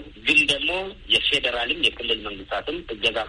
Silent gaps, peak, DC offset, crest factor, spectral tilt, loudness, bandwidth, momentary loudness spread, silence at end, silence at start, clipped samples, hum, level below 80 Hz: none; -6 dBFS; under 0.1%; 18 dB; -2 dB/octave; -21 LUFS; 11.5 kHz; 12 LU; 0 s; 0 s; under 0.1%; none; -46 dBFS